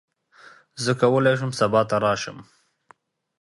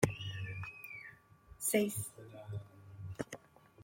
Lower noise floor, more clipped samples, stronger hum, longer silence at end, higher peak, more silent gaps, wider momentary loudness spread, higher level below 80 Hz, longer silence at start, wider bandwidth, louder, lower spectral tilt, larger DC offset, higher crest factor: about the same, -57 dBFS vs -60 dBFS; neither; neither; first, 1 s vs 0 s; first, -4 dBFS vs -12 dBFS; neither; second, 11 LU vs 19 LU; about the same, -60 dBFS vs -64 dBFS; first, 0.75 s vs 0 s; second, 11.5 kHz vs 16.5 kHz; first, -21 LUFS vs -40 LUFS; about the same, -5.5 dB/octave vs -4.5 dB/octave; neither; second, 20 dB vs 28 dB